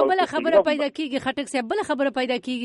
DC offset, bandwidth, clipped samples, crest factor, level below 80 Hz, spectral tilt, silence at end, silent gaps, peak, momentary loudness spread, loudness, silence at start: under 0.1%; 11.5 kHz; under 0.1%; 16 dB; -62 dBFS; -3.5 dB/octave; 0 s; none; -6 dBFS; 7 LU; -23 LUFS; 0 s